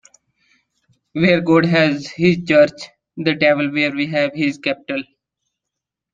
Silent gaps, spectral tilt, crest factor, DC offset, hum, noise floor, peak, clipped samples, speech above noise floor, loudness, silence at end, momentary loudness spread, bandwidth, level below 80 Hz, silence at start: none; -6.5 dB/octave; 16 dB; under 0.1%; none; -82 dBFS; -2 dBFS; under 0.1%; 66 dB; -17 LUFS; 1.1 s; 12 LU; 7.8 kHz; -56 dBFS; 1.15 s